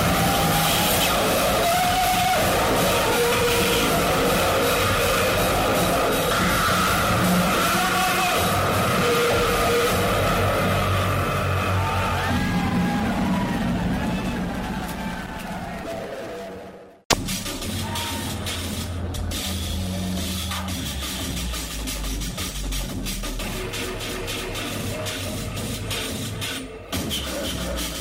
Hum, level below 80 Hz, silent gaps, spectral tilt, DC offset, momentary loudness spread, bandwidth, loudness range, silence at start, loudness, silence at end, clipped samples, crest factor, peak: none; -36 dBFS; 17.05-17.10 s; -4 dB/octave; under 0.1%; 10 LU; 16.5 kHz; 9 LU; 0 s; -22 LUFS; 0 s; under 0.1%; 22 dB; 0 dBFS